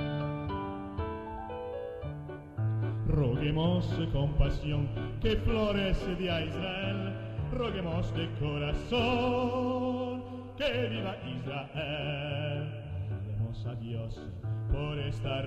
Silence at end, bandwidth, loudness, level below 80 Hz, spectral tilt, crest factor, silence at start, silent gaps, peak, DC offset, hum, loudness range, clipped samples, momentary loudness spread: 0 s; 8.2 kHz; -33 LUFS; -40 dBFS; -7.5 dB/octave; 18 dB; 0 s; none; -14 dBFS; under 0.1%; none; 5 LU; under 0.1%; 10 LU